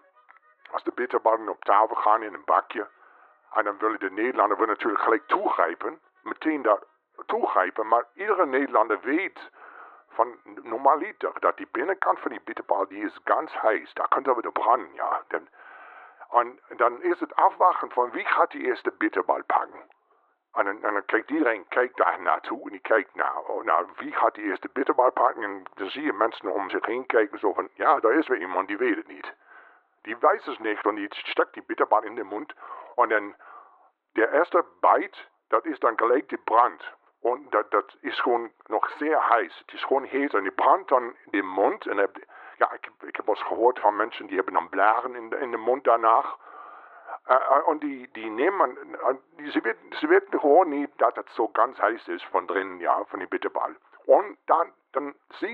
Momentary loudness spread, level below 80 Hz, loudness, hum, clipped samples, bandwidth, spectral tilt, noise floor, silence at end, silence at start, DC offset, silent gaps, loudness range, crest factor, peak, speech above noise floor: 13 LU; -86 dBFS; -25 LUFS; none; under 0.1%; 4.8 kHz; -6.5 dB/octave; -67 dBFS; 0 s; 0.75 s; under 0.1%; none; 3 LU; 20 dB; -6 dBFS; 42 dB